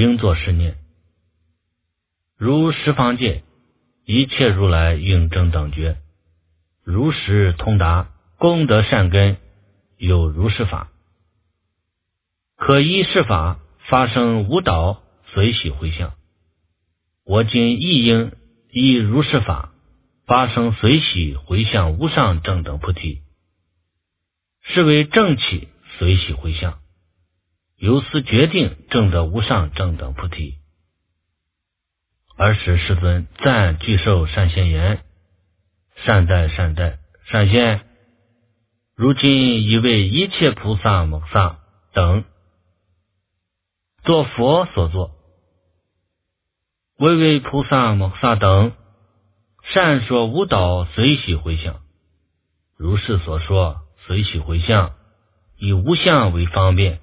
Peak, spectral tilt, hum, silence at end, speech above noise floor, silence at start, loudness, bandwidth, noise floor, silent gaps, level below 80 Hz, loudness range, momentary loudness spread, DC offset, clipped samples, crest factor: 0 dBFS; -10.5 dB/octave; none; 0.05 s; 63 dB; 0 s; -17 LUFS; 4 kHz; -79 dBFS; none; -28 dBFS; 4 LU; 11 LU; under 0.1%; under 0.1%; 18 dB